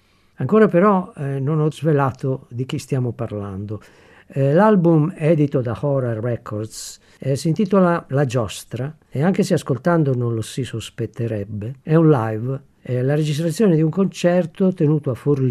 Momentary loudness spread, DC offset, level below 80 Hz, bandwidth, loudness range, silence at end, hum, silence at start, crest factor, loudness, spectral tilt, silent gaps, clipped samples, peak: 14 LU; under 0.1%; -58 dBFS; 13 kHz; 3 LU; 0 s; none; 0.4 s; 18 dB; -19 LUFS; -7.5 dB/octave; none; under 0.1%; -2 dBFS